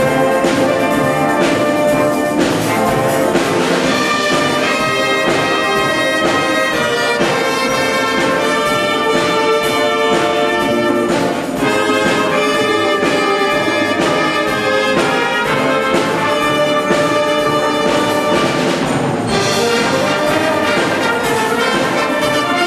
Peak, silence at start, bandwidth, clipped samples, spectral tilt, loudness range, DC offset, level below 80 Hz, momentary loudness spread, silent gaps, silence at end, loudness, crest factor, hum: -2 dBFS; 0 s; 15.5 kHz; under 0.1%; -4 dB/octave; 1 LU; under 0.1%; -46 dBFS; 1 LU; none; 0 s; -14 LUFS; 12 dB; none